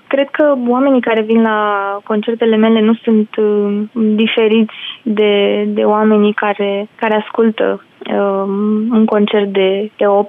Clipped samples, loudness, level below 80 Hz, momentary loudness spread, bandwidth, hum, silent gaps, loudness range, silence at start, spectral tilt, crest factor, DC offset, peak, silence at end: under 0.1%; -13 LUFS; -68 dBFS; 6 LU; 3.8 kHz; none; none; 2 LU; 0.1 s; -9 dB/octave; 10 dB; under 0.1%; -2 dBFS; 0 s